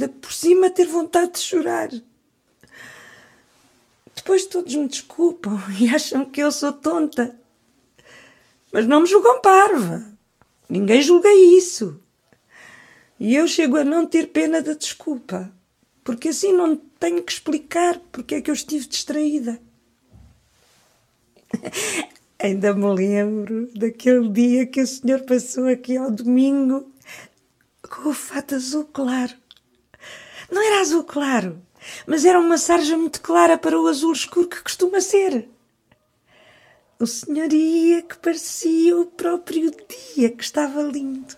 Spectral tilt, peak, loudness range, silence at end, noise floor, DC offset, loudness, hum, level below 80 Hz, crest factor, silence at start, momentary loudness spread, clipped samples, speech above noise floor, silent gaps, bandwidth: -4 dB/octave; -2 dBFS; 10 LU; 0.05 s; -64 dBFS; under 0.1%; -19 LUFS; none; -66 dBFS; 18 dB; 0 s; 14 LU; under 0.1%; 45 dB; none; 15.5 kHz